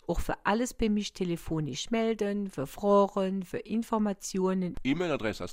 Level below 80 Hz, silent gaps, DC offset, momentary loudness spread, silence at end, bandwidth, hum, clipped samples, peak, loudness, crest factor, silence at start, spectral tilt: -46 dBFS; none; under 0.1%; 8 LU; 0 s; 16 kHz; none; under 0.1%; -12 dBFS; -30 LUFS; 16 dB; 0.1 s; -5.5 dB/octave